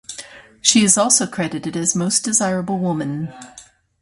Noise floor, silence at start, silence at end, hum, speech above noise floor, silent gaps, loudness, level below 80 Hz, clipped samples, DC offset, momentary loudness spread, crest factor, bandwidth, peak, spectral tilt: -39 dBFS; 0.1 s; 0.4 s; none; 21 dB; none; -17 LUFS; -58 dBFS; under 0.1%; under 0.1%; 15 LU; 20 dB; 11.5 kHz; 0 dBFS; -3 dB/octave